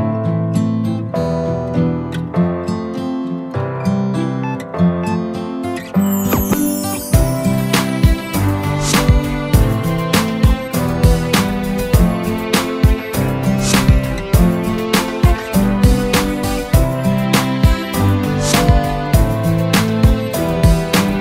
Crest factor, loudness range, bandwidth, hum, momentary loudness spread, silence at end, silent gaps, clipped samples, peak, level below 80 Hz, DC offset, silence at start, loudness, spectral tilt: 14 dB; 4 LU; 16.5 kHz; none; 6 LU; 0 s; none; under 0.1%; 0 dBFS; -22 dBFS; under 0.1%; 0 s; -16 LUFS; -5.5 dB/octave